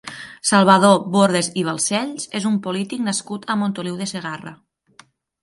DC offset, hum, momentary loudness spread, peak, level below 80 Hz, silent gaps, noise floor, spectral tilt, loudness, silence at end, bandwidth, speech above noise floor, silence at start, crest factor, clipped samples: under 0.1%; none; 15 LU; 0 dBFS; -66 dBFS; none; -52 dBFS; -4.5 dB/octave; -19 LUFS; 0.9 s; 11.5 kHz; 33 dB; 0.05 s; 20 dB; under 0.1%